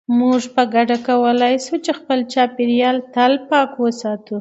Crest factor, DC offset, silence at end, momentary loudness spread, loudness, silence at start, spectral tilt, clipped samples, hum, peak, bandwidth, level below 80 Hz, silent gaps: 16 dB; under 0.1%; 0 s; 5 LU; -17 LUFS; 0.1 s; -4 dB/octave; under 0.1%; none; 0 dBFS; 8.2 kHz; -70 dBFS; none